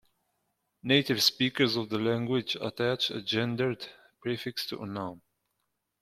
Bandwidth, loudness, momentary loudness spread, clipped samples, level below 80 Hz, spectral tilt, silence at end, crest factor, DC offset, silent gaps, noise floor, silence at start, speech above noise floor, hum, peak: 16 kHz; -29 LUFS; 14 LU; under 0.1%; -68 dBFS; -4.5 dB/octave; 0.85 s; 22 dB; under 0.1%; none; -81 dBFS; 0.85 s; 51 dB; none; -8 dBFS